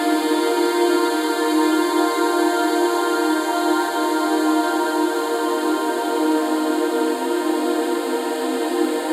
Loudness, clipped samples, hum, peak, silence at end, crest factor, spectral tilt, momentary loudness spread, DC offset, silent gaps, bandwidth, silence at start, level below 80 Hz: -20 LUFS; under 0.1%; none; -6 dBFS; 0 s; 12 dB; -1.5 dB/octave; 3 LU; under 0.1%; none; 16 kHz; 0 s; under -90 dBFS